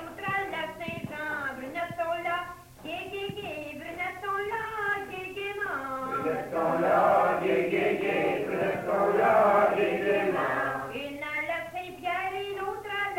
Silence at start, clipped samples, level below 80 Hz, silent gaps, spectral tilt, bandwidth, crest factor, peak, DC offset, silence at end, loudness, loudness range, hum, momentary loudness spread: 0 s; under 0.1%; -62 dBFS; none; -5.5 dB/octave; 16 kHz; 16 dB; -12 dBFS; under 0.1%; 0 s; -29 LUFS; 9 LU; none; 13 LU